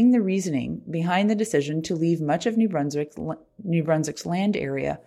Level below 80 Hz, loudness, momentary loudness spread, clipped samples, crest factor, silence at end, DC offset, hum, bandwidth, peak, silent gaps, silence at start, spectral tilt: -58 dBFS; -25 LUFS; 8 LU; under 0.1%; 14 dB; 0.05 s; under 0.1%; none; 13 kHz; -10 dBFS; none; 0 s; -6.5 dB/octave